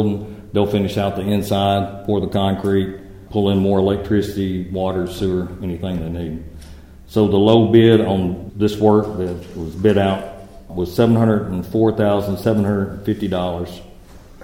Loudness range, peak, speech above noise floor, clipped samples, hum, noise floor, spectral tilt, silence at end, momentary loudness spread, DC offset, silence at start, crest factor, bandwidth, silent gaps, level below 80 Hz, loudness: 4 LU; 0 dBFS; 23 dB; under 0.1%; none; -41 dBFS; -7.5 dB/octave; 0 s; 13 LU; under 0.1%; 0 s; 18 dB; 16.5 kHz; none; -40 dBFS; -18 LUFS